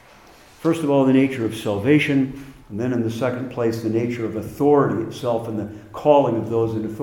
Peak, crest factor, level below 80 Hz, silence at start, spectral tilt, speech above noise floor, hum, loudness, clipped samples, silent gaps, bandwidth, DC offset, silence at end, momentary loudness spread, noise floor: -2 dBFS; 18 dB; -54 dBFS; 0.6 s; -7 dB/octave; 28 dB; none; -21 LUFS; under 0.1%; none; 17 kHz; under 0.1%; 0 s; 11 LU; -48 dBFS